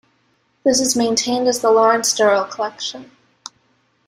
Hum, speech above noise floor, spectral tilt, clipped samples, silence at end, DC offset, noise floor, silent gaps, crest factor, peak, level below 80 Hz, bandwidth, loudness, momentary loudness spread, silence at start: none; 46 dB; -2 dB/octave; under 0.1%; 1.05 s; under 0.1%; -62 dBFS; none; 16 dB; -2 dBFS; -62 dBFS; 16 kHz; -17 LUFS; 24 LU; 0.65 s